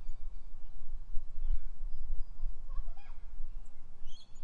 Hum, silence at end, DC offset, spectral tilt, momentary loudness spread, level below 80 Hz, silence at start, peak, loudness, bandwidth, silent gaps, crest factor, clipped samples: none; 0 s; under 0.1%; -6 dB/octave; 12 LU; -36 dBFS; 0 s; -16 dBFS; -48 LUFS; 3.4 kHz; none; 12 dB; under 0.1%